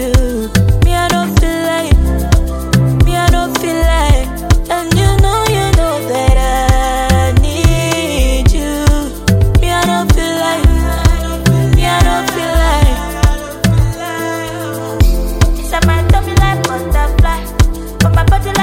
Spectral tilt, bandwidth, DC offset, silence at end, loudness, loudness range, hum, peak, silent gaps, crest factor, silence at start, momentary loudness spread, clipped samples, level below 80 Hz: -5.5 dB/octave; 17 kHz; under 0.1%; 0 s; -13 LUFS; 2 LU; none; 0 dBFS; none; 10 dB; 0 s; 4 LU; under 0.1%; -14 dBFS